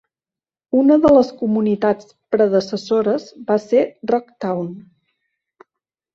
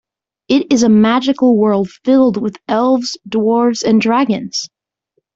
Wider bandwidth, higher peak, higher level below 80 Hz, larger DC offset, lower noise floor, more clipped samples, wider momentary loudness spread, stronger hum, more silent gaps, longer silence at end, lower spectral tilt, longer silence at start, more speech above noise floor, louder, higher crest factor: about the same, 7.6 kHz vs 7.8 kHz; about the same, -2 dBFS vs -2 dBFS; about the same, -54 dBFS vs -56 dBFS; neither; first, under -90 dBFS vs -67 dBFS; neither; first, 11 LU vs 8 LU; neither; neither; first, 1.35 s vs 0.7 s; first, -7 dB/octave vs -5 dB/octave; first, 0.75 s vs 0.5 s; first, over 73 dB vs 54 dB; second, -18 LUFS vs -14 LUFS; about the same, 16 dB vs 12 dB